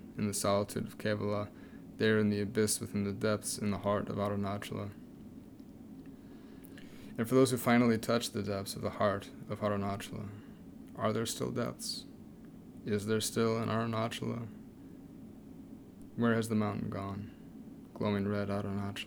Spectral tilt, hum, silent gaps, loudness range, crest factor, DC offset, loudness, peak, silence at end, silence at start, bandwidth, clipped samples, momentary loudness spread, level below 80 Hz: -5 dB/octave; none; none; 6 LU; 20 dB; under 0.1%; -34 LUFS; -14 dBFS; 0 s; 0 s; over 20 kHz; under 0.1%; 21 LU; -64 dBFS